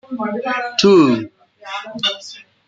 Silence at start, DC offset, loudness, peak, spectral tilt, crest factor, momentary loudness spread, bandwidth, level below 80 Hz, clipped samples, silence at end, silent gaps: 0.1 s; under 0.1%; -16 LUFS; -2 dBFS; -5 dB/octave; 16 dB; 19 LU; 7.8 kHz; -64 dBFS; under 0.1%; 0.25 s; none